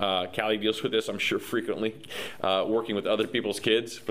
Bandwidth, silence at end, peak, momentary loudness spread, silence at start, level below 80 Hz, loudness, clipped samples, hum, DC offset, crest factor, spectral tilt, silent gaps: 15.5 kHz; 0 s; -8 dBFS; 6 LU; 0 s; -64 dBFS; -28 LUFS; under 0.1%; none; 0.2%; 20 dB; -4 dB/octave; none